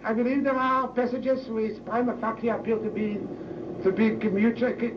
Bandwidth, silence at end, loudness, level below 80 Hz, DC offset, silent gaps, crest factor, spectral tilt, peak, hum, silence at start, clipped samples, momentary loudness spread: 6.4 kHz; 0 s; -27 LUFS; -58 dBFS; under 0.1%; none; 14 dB; -8.5 dB/octave; -12 dBFS; none; 0 s; under 0.1%; 7 LU